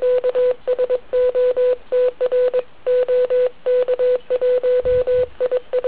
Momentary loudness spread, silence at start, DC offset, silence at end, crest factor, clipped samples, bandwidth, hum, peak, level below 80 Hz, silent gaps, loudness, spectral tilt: 3 LU; 0 s; 1%; 0 s; 8 dB; under 0.1%; 4 kHz; none; -8 dBFS; -46 dBFS; none; -18 LUFS; -8 dB/octave